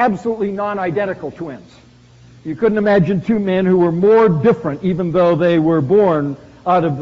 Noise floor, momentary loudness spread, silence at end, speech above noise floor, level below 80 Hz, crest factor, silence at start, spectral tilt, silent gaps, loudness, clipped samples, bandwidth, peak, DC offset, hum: -44 dBFS; 13 LU; 0 s; 29 dB; -48 dBFS; 12 dB; 0 s; -7 dB/octave; none; -15 LUFS; under 0.1%; 7.6 kHz; -4 dBFS; under 0.1%; none